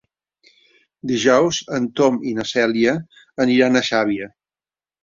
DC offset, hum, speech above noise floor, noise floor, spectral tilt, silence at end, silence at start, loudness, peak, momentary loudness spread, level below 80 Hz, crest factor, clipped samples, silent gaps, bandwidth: under 0.1%; none; over 72 dB; under -90 dBFS; -4.5 dB/octave; 0.75 s; 1.05 s; -18 LUFS; -2 dBFS; 12 LU; -60 dBFS; 18 dB; under 0.1%; none; 7.6 kHz